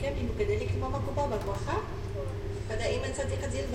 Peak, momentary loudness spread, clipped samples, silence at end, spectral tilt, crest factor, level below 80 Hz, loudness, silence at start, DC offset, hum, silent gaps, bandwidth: -16 dBFS; 6 LU; under 0.1%; 0 s; -6 dB/octave; 14 dB; -38 dBFS; -33 LUFS; 0 s; under 0.1%; none; none; 13 kHz